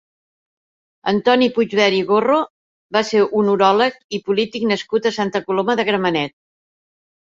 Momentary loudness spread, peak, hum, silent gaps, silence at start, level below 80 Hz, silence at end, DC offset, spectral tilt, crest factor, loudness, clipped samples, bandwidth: 7 LU; -2 dBFS; none; 2.50-2.89 s, 4.04-4.09 s; 1.05 s; -62 dBFS; 1.1 s; under 0.1%; -5 dB/octave; 18 dB; -18 LUFS; under 0.1%; 7.6 kHz